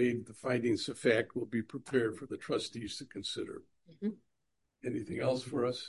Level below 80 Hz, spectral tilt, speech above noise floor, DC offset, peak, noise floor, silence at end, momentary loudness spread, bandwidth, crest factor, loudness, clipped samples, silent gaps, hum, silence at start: -68 dBFS; -5 dB/octave; 47 dB; under 0.1%; -14 dBFS; -82 dBFS; 0 s; 11 LU; 11.5 kHz; 20 dB; -36 LUFS; under 0.1%; none; none; 0 s